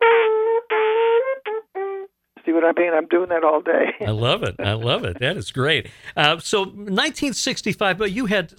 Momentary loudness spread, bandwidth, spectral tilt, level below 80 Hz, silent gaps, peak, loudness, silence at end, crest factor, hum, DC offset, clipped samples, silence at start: 10 LU; 15.5 kHz; -4.5 dB/octave; -52 dBFS; none; -2 dBFS; -20 LUFS; 0.1 s; 18 dB; none; under 0.1%; under 0.1%; 0 s